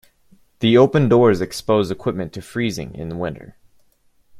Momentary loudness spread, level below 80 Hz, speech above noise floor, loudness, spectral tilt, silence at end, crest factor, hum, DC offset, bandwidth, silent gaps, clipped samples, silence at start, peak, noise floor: 15 LU; -50 dBFS; 40 dB; -19 LUFS; -6.5 dB/octave; 0 s; 18 dB; none; under 0.1%; 14.5 kHz; none; under 0.1%; 0.6 s; -2 dBFS; -57 dBFS